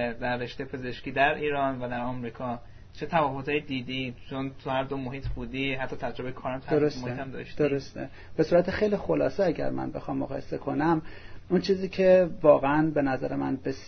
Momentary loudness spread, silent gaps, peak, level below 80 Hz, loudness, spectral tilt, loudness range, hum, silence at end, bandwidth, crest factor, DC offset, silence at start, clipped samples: 14 LU; none; -6 dBFS; -48 dBFS; -28 LUFS; -7 dB/octave; 7 LU; none; 0 s; 6.6 kHz; 22 dB; under 0.1%; 0 s; under 0.1%